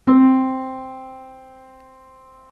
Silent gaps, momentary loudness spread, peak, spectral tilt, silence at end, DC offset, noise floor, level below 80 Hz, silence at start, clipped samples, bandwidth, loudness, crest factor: none; 26 LU; -4 dBFS; -8.5 dB/octave; 1.25 s; under 0.1%; -47 dBFS; -58 dBFS; 0.05 s; under 0.1%; 3.7 kHz; -17 LUFS; 16 dB